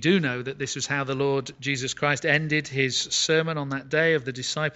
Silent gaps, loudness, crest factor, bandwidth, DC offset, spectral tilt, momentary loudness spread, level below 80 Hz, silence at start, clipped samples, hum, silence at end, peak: none; -25 LUFS; 18 dB; 8.2 kHz; under 0.1%; -3.5 dB/octave; 7 LU; -62 dBFS; 0 s; under 0.1%; none; 0 s; -6 dBFS